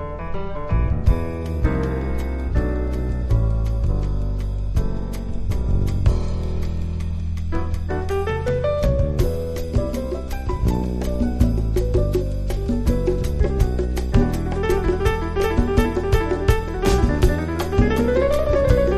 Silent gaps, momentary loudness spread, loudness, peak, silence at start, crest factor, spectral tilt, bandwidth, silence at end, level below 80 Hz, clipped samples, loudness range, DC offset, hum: none; 7 LU; -22 LUFS; -2 dBFS; 0 s; 18 dB; -7.5 dB/octave; 13.5 kHz; 0 s; -22 dBFS; under 0.1%; 4 LU; under 0.1%; none